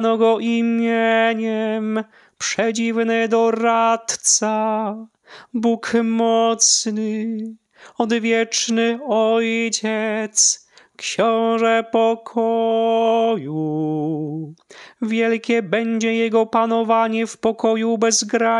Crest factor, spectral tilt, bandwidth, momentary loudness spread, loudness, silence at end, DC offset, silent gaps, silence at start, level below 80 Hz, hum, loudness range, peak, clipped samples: 14 dB; -3 dB/octave; 11.5 kHz; 9 LU; -19 LUFS; 0 s; under 0.1%; none; 0 s; -70 dBFS; none; 2 LU; -4 dBFS; under 0.1%